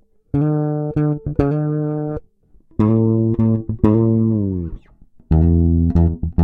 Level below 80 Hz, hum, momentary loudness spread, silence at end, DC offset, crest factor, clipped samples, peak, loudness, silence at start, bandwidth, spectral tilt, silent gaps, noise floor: -28 dBFS; none; 9 LU; 0 s; under 0.1%; 16 dB; under 0.1%; 0 dBFS; -18 LUFS; 0.35 s; 3.6 kHz; -12.5 dB/octave; none; -50 dBFS